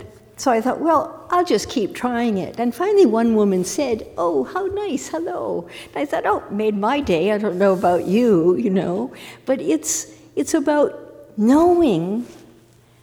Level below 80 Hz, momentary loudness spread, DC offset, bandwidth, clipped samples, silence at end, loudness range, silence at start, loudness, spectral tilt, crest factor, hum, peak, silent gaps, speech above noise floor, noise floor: -52 dBFS; 11 LU; under 0.1%; 19 kHz; under 0.1%; 0.7 s; 3 LU; 0 s; -19 LUFS; -5 dB/octave; 14 dB; none; -4 dBFS; none; 32 dB; -51 dBFS